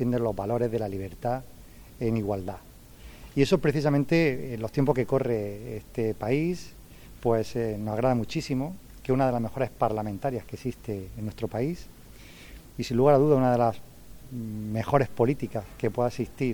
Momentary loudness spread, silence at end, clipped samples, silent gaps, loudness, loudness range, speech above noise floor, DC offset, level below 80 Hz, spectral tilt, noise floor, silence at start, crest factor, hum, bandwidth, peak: 14 LU; 0 s; under 0.1%; none; -27 LUFS; 5 LU; 21 dB; under 0.1%; -50 dBFS; -7.5 dB/octave; -47 dBFS; 0 s; 20 dB; none; 19.5 kHz; -8 dBFS